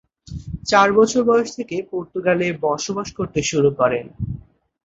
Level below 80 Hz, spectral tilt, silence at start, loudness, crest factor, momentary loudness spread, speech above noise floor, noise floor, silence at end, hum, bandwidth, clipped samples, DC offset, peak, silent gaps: -44 dBFS; -4.5 dB/octave; 0.3 s; -19 LUFS; 18 dB; 15 LU; 21 dB; -40 dBFS; 0.45 s; none; 8 kHz; under 0.1%; under 0.1%; -2 dBFS; none